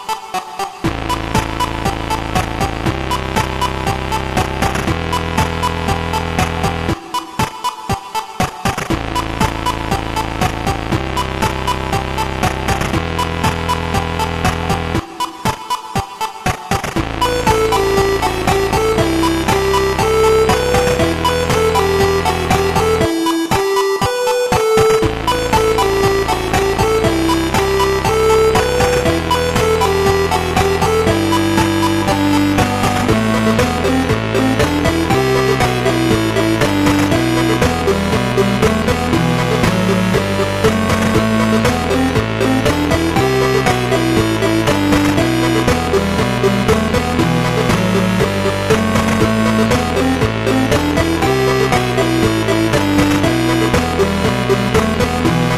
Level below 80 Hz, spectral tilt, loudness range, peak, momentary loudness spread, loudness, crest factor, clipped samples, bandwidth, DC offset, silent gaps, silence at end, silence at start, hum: -28 dBFS; -5 dB/octave; 5 LU; 0 dBFS; 6 LU; -15 LUFS; 14 dB; under 0.1%; 14 kHz; under 0.1%; none; 0 s; 0 s; none